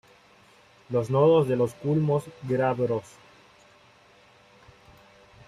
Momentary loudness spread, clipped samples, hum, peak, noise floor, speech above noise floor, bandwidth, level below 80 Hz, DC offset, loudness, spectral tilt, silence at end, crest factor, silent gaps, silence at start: 10 LU; under 0.1%; none; -10 dBFS; -57 dBFS; 33 dB; 13.5 kHz; -64 dBFS; under 0.1%; -25 LUFS; -8 dB/octave; 2.45 s; 18 dB; none; 0.9 s